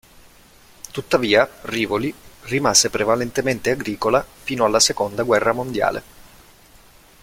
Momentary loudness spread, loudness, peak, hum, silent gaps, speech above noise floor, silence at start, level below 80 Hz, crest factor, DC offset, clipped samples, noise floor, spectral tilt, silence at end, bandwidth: 13 LU; -19 LUFS; 0 dBFS; none; none; 30 dB; 0.95 s; -48 dBFS; 20 dB; under 0.1%; under 0.1%; -49 dBFS; -3 dB/octave; 0.95 s; 16.5 kHz